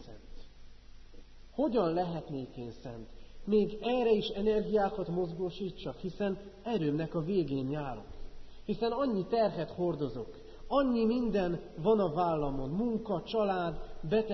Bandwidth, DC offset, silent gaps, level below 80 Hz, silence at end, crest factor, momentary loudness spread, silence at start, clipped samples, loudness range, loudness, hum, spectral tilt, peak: 6 kHz; under 0.1%; none; -50 dBFS; 0 s; 16 dB; 15 LU; 0 s; under 0.1%; 4 LU; -32 LUFS; none; -6 dB/octave; -16 dBFS